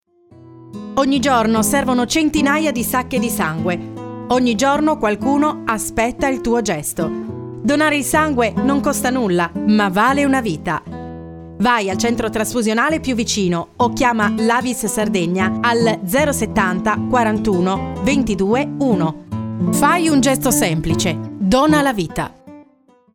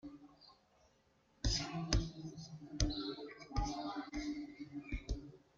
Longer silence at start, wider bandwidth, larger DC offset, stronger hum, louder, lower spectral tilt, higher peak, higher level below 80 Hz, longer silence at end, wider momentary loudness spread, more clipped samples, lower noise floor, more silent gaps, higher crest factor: first, 0.45 s vs 0.05 s; first, 19 kHz vs 7.6 kHz; neither; neither; first, -17 LUFS vs -42 LUFS; about the same, -4.5 dB/octave vs -4.5 dB/octave; first, -2 dBFS vs -18 dBFS; about the same, -42 dBFS vs -46 dBFS; first, 0.5 s vs 0.2 s; second, 8 LU vs 13 LU; neither; second, -53 dBFS vs -73 dBFS; neither; second, 16 dB vs 26 dB